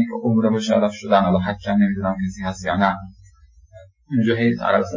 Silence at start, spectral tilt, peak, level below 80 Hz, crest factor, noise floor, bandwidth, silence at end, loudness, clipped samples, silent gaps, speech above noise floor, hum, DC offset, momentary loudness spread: 0 s; -7 dB/octave; -2 dBFS; -46 dBFS; 18 dB; -50 dBFS; 7.6 kHz; 0 s; -20 LUFS; under 0.1%; none; 31 dB; none; under 0.1%; 7 LU